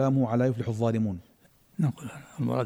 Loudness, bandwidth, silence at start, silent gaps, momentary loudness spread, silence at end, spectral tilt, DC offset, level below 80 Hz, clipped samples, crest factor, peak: -28 LUFS; 12.5 kHz; 0 s; none; 17 LU; 0 s; -8.5 dB/octave; under 0.1%; -62 dBFS; under 0.1%; 14 dB; -14 dBFS